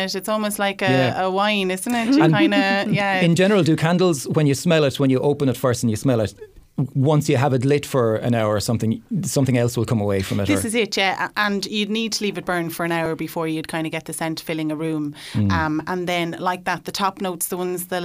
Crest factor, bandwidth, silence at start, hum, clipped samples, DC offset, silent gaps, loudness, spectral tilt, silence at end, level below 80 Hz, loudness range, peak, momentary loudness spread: 18 dB; 16 kHz; 0 s; none; under 0.1%; under 0.1%; none; -20 LUFS; -5.5 dB/octave; 0 s; -54 dBFS; 6 LU; -2 dBFS; 9 LU